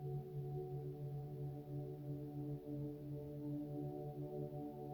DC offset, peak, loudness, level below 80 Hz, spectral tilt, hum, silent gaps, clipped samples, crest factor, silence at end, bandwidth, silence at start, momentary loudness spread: under 0.1%; -36 dBFS; -48 LUFS; -68 dBFS; -10.5 dB/octave; none; none; under 0.1%; 10 dB; 0 s; 20 kHz; 0 s; 2 LU